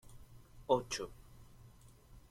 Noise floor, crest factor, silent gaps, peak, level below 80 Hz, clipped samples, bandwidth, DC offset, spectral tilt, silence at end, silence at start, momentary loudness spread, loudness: -60 dBFS; 26 dB; none; -16 dBFS; -60 dBFS; under 0.1%; 16.5 kHz; under 0.1%; -4 dB/octave; 0.1 s; 0.05 s; 27 LU; -37 LUFS